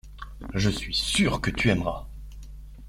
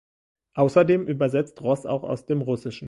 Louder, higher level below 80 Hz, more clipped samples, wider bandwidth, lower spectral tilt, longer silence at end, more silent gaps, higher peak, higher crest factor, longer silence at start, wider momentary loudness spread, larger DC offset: about the same, -25 LUFS vs -23 LUFS; first, -38 dBFS vs -62 dBFS; neither; first, 16 kHz vs 11.5 kHz; second, -4.5 dB/octave vs -8 dB/octave; about the same, 0 s vs 0 s; neither; about the same, -6 dBFS vs -6 dBFS; about the same, 20 dB vs 18 dB; second, 0.05 s vs 0.55 s; first, 21 LU vs 9 LU; neither